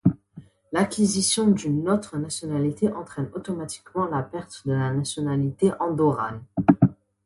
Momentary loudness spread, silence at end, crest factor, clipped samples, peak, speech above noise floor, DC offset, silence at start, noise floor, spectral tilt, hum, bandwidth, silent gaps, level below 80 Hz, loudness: 11 LU; 0.35 s; 22 dB; under 0.1%; -2 dBFS; 23 dB; under 0.1%; 0.05 s; -48 dBFS; -5.5 dB/octave; none; 11.5 kHz; none; -54 dBFS; -24 LUFS